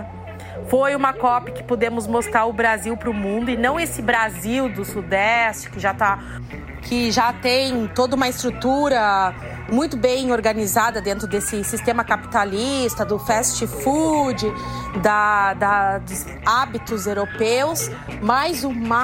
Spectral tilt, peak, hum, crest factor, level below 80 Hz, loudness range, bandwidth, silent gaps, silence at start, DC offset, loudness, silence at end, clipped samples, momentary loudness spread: -4 dB/octave; -2 dBFS; none; 18 dB; -42 dBFS; 1 LU; 16.5 kHz; none; 0 s; under 0.1%; -20 LUFS; 0 s; under 0.1%; 8 LU